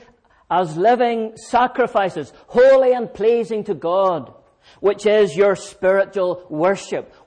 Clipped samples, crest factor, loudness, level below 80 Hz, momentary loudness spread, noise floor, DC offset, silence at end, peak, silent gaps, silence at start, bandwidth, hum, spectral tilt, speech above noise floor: under 0.1%; 12 dB; -18 LUFS; -56 dBFS; 9 LU; -52 dBFS; under 0.1%; 0.2 s; -6 dBFS; none; 0.5 s; 9.8 kHz; none; -5.5 dB/octave; 35 dB